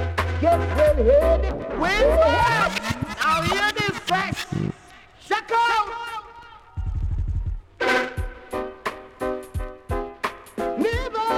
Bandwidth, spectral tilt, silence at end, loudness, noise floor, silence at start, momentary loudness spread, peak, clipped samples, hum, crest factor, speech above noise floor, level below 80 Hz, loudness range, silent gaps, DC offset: 16.5 kHz; -5 dB/octave; 0 s; -23 LUFS; -47 dBFS; 0 s; 15 LU; -8 dBFS; under 0.1%; none; 14 dB; 28 dB; -32 dBFS; 8 LU; none; under 0.1%